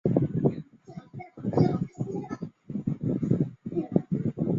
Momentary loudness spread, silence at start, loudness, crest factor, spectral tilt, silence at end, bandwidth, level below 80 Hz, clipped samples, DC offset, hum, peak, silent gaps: 18 LU; 0.05 s; -29 LUFS; 24 dB; -10.5 dB/octave; 0 s; 7.2 kHz; -56 dBFS; under 0.1%; under 0.1%; none; -6 dBFS; none